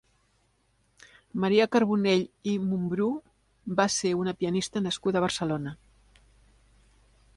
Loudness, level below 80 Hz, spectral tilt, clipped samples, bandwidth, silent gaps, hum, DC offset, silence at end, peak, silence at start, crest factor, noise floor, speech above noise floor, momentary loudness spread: -27 LUFS; -62 dBFS; -5 dB/octave; under 0.1%; 11.5 kHz; none; none; under 0.1%; 1.6 s; -10 dBFS; 1.35 s; 20 dB; -69 dBFS; 43 dB; 9 LU